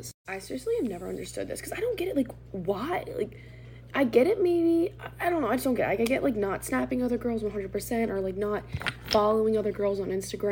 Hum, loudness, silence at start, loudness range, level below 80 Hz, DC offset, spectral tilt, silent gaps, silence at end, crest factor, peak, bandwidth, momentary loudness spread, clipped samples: none; -28 LUFS; 0 s; 6 LU; -50 dBFS; under 0.1%; -5.5 dB/octave; 0.14-0.25 s; 0 s; 20 dB; -8 dBFS; 17 kHz; 12 LU; under 0.1%